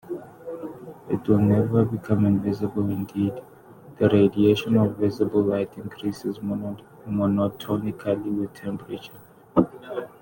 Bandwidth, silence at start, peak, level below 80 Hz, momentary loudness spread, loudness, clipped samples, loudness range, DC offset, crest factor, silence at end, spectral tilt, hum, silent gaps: 17 kHz; 0.05 s; -4 dBFS; -56 dBFS; 17 LU; -24 LUFS; under 0.1%; 5 LU; under 0.1%; 20 dB; 0.15 s; -8.5 dB/octave; none; none